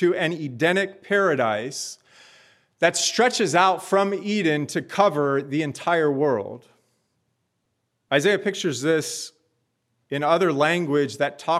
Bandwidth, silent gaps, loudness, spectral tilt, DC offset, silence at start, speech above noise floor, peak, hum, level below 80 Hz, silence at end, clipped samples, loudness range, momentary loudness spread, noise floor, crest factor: 14.5 kHz; none; -22 LUFS; -4 dB/octave; under 0.1%; 0 s; 53 dB; -4 dBFS; none; -78 dBFS; 0 s; under 0.1%; 5 LU; 8 LU; -75 dBFS; 20 dB